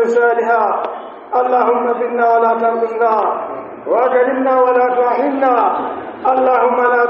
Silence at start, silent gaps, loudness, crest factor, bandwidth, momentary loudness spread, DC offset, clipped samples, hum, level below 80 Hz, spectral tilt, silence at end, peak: 0 s; none; -14 LUFS; 12 dB; 7.2 kHz; 8 LU; under 0.1%; under 0.1%; none; -64 dBFS; -3 dB/octave; 0 s; -2 dBFS